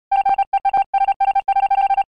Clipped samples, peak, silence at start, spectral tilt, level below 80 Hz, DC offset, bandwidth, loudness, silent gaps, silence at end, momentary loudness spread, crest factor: under 0.1%; -10 dBFS; 0.1 s; -3 dB/octave; -52 dBFS; 0.4%; 5 kHz; -18 LUFS; 0.47-0.52 s, 0.86-0.93 s, 1.16-1.20 s; 0.15 s; 2 LU; 8 dB